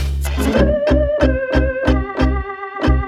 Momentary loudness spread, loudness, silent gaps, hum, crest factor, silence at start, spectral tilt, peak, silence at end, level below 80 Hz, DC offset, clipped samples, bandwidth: 6 LU; -17 LUFS; none; none; 14 dB; 0 s; -7 dB/octave; -2 dBFS; 0 s; -20 dBFS; under 0.1%; under 0.1%; 13.5 kHz